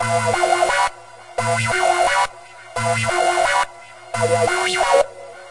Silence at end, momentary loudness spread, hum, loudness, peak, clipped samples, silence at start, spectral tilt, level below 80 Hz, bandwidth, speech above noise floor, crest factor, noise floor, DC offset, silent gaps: 0 s; 9 LU; none; -18 LUFS; -2 dBFS; under 0.1%; 0 s; -3 dB/octave; -50 dBFS; 11.5 kHz; 22 dB; 18 dB; -39 dBFS; under 0.1%; none